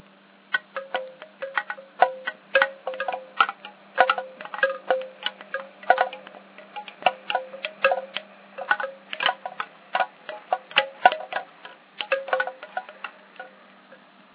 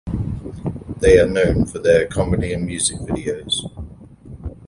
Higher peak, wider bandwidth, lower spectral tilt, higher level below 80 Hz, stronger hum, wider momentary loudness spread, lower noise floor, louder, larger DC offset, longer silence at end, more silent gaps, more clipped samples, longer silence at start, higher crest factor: about the same, 0 dBFS vs 0 dBFS; second, 4 kHz vs 11.5 kHz; second, 2.5 dB/octave vs -4.5 dB/octave; second, under -90 dBFS vs -32 dBFS; neither; about the same, 18 LU vs 20 LU; first, -54 dBFS vs -39 dBFS; second, -26 LUFS vs -19 LUFS; neither; first, 0.4 s vs 0 s; neither; neither; first, 0.5 s vs 0.05 s; first, 28 dB vs 18 dB